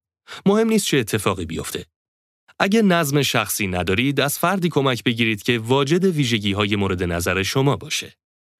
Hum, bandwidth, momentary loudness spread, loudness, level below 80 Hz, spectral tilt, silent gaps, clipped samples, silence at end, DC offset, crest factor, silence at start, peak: none; 16 kHz; 8 LU; -20 LUFS; -50 dBFS; -4.5 dB/octave; 1.96-2.47 s; under 0.1%; 0.5 s; under 0.1%; 18 dB; 0.3 s; -2 dBFS